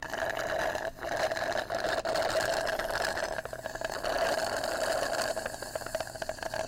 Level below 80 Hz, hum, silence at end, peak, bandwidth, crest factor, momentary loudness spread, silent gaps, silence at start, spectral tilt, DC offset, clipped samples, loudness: -52 dBFS; none; 0 s; -22 dBFS; 17 kHz; 12 dB; 7 LU; none; 0 s; -2.5 dB/octave; under 0.1%; under 0.1%; -32 LUFS